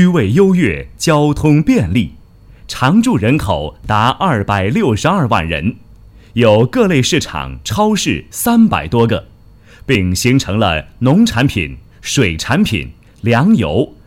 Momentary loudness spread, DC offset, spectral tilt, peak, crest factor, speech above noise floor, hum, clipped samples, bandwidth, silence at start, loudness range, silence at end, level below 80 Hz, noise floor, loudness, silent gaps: 9 LU; under 0.1%; -5.5 dB/octave; 0 dBFS; 14 dB; 28 dB; none; under 0.1%; 16.5 kHz; 0 s; 2 LU; 0.2 s; -34 dBFS; -41 dBFS; -13 LUFS; none